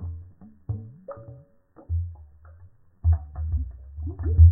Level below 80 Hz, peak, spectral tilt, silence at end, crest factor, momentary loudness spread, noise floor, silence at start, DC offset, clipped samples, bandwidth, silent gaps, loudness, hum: -28 dBFS; -4 dBFS; -15 dB/octave; 0 s; 20 dB; 19 LU; -53 dBFS; 0 s; under 0.1%; under 0.1%; 1.8 kHz; none; -28 LUFS; none